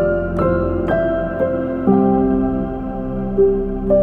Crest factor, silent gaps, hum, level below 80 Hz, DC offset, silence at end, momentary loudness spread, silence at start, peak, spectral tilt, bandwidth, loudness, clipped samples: 14 dB; none; none; -30 dBFS; under 0.1%; 0 s; 8 LU; 0 s; -2 dBFS; -11 dB/octave; 4.3 kHz; -18 LUFS; under 0.1%